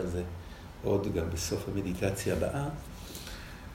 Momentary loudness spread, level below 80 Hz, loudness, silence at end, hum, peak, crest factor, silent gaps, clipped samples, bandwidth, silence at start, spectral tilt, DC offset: 13 LU; -48 dBFS; -34 LUFS; 0 s; none; -14 dBFS; 20 dB; none; under 0.1%; 16 kHz; 0 s; -5.5 dB/octave; under 0.1%